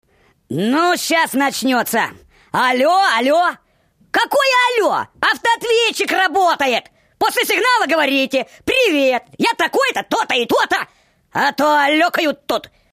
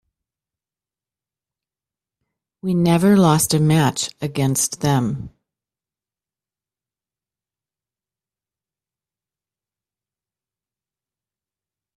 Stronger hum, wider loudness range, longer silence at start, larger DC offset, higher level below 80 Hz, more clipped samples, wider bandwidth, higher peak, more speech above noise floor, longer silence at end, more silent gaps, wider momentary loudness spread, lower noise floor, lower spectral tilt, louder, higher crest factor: neither; second, 1 LU vs 9 LU; second, 0.5 s vs 2.65 s; neither; about the same, -58 dBFS vs -56 dBFS; neither; about the same, 15.5 kHz vs 15.5 kHz; about the same, -4 dBFS vs -2 dBFS; second, 41 dB vs over 73 dB; second, 0.25 s vs 6.7 s; neither; second, 7 LU vs 11 LU; second, -57 dBFS vs under -90 dBFS; second, -2.5 dB/octave vs -5 dB/octave; about the same, -16 LUFS vs -18 LUFS; second, 14 dB vs 20 dB